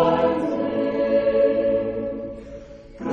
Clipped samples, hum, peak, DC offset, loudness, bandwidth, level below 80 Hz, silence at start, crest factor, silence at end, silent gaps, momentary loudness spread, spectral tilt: under 0.1%; none; -6 dBFS; under 0.1%; -22 LUFS; 6.4 kHz; -48 dBFS; 0 s; 16 dB; 0 s; none; 17 LU; -8 dB/octave